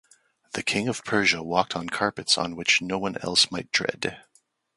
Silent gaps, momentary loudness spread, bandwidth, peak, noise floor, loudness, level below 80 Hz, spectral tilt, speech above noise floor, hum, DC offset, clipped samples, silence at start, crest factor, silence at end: none; 8 LU; 11.5 kHz; -4 dBFS; -59 dBFS; -24 LUFS; -60 dBFS; -2.5 dB/octave; 34 dB; none; under 0.1%; under 0.1%; 0.55 s; 22 dB; 0.6 s